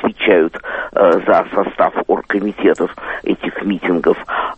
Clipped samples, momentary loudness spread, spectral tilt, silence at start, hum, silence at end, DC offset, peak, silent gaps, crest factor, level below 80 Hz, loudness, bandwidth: under 0.1%; 7 LU; -7 dB/octave; 0 s; none; 0.05 s; under 0.1%; 0 dBFS; none; 16 dB; -48 dBFS; -16 LUFS; 8.4 kHz